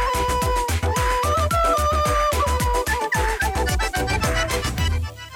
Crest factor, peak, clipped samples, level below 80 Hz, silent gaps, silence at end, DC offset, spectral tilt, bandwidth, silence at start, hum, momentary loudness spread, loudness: 10 dB; -10 dBFS; under 0.1%; -26 dBFS; none; 0 s; under 0.1%; -4 dB/octave; 17.5 kHz; 0 s; none; 4 LU; -21 LUFS